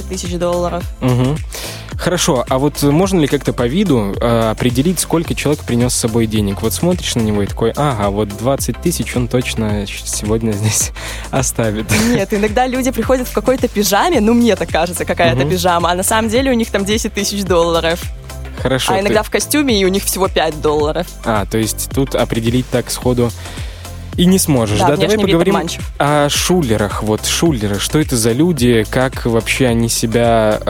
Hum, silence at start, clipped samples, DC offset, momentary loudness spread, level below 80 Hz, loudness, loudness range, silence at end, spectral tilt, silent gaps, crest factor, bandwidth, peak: none; 0 s; under 0.1%; under 0.1%; 6 LU; -30 dBFS; -15 LUFS; 3 LU; 0 s; -4.5 dB/octave; none; 14 dB; 17 kHz; 0 dBFS